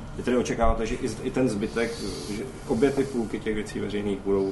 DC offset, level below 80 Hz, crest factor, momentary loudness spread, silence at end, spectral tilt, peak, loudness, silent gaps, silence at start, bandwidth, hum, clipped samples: under 0.1%; -36 dBFS; 18 dB; 8 LU; 0 s; -5.5 dB/octave; -8 dBFS; -27 LUFS; none; 0 s; 11.5 kHz; none; under 0.1%